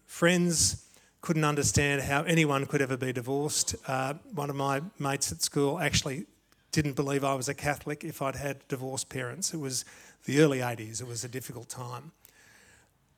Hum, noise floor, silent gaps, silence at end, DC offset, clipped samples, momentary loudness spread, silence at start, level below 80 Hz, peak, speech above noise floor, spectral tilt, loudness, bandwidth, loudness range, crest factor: none; -62 dBFS; none; 1.05 s; under 0.1%; under 0.1%; 15 LU; 0.1 s; -56 dBFS; -8 dBFS; 33 dB; -4 dB/octave; -29 LUFS; 19 kHz; 5 LU; 22 dB